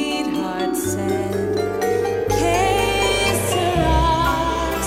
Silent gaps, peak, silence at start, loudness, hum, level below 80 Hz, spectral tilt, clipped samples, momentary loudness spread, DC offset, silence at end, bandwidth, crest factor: none; -6 dBFS; 0 s; -19 LUFS; none; -30 dBFS; -4.5 dB/octave; under 0.1%; 5 LU; under 0.1%; 0 s; 16.5 kHz; 14 dB